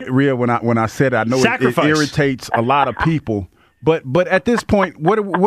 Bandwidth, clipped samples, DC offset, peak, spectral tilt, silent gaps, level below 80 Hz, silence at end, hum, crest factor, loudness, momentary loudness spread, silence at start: 15 kHz; under 0.1%; under 0.1%; -2 dBFS; -6 dB/octave; none; -42 dBFS; 0 s; none; 14 dB; -16 LUFS; 4 LU; 0 s